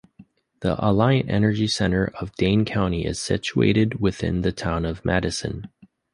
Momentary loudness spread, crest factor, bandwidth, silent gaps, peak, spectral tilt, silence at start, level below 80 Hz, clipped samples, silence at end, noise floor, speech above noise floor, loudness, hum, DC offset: 7 LU; 18 dB; 11 kHz; none; -4 dBFS; -6 dB/octave; 0.2 s; -40 dBFS; under 0.1%; 0.45 s; -52 dBFS; 31 dB; -22 LUFS; none; under 0.1%